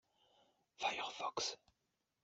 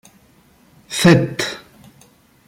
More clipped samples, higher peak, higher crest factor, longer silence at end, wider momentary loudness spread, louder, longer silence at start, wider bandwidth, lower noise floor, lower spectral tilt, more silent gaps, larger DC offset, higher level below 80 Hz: neither; second, -26 dBFS vs -2 dBFS; about the same, 20 dB vs 18 dB; second, 0.7 s vs 0.9 s; second, 3 LU vs 15 LU; second, -42 LUFS vs -16 LUFS; about the same, 0.8 s vs 0.9 s; second, 8.2 kHz vs 16 kHz; first, -87 dBFS vs -53 dBFS; second, -0.5 dB/octave vs -5 dB/octave; neither; neither; second, -84 dBFS vs -52 dBFS